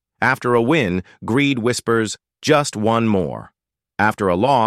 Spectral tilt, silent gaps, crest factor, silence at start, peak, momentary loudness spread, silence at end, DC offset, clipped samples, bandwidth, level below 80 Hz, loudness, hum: -5 dB/octave; none; 16 dB; 0.2 s; -2 dBFS; 10 LU; 0 s; under 0.1%; under 0.1%; 14.5 kHz; -52 dBFS; -18 LUFS; none